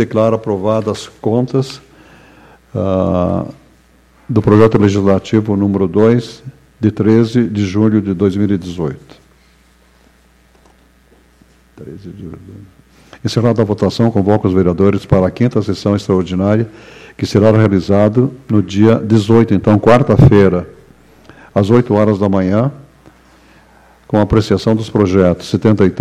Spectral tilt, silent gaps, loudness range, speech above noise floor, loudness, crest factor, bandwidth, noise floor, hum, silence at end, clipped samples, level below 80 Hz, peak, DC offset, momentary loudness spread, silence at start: -8 dB/octave; none; 8 LU; 37 dB; -13 LUFS; 14 dB; 10.5 kHz; -49 dBFS; none; 0 s; under 0.1%; -38 dBFS; 0 dBFS; under 0.1%; 13 LU; 0 s